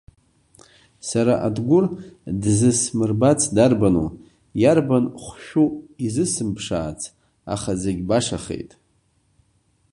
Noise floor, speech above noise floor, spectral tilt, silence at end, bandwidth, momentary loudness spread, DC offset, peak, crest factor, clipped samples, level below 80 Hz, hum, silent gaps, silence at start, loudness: -64 dBFS; 44 dB; -5.5 dB/octave; 1.25 s; 11.5 kHz; 15 LU; under 0.1%; -2 dBFS; 20 dB; under 0.1%; -46 dBFS; none; none; 1.05 s; -21 LUFS